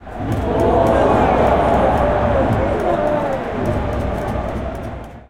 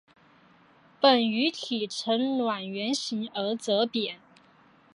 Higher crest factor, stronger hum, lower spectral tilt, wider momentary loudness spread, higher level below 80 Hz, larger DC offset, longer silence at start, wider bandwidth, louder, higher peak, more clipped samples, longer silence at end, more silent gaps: about the same, 16 dB vs 20 dB; neither; first, -8 dB/octave vs -3.5 dB/octave; about the same, 10 LU vs 10 LU; first, -28 dBFS vs -80 dBFS; neither; second, 0 s vs 1 s; first, 16.5 kHz vs 11 kHz; first, -17 LUFS vs -27 LUFS; first, -2 dBFS vs -8 dBFS; neither; second, 0.1 s vs 0.8 s; neither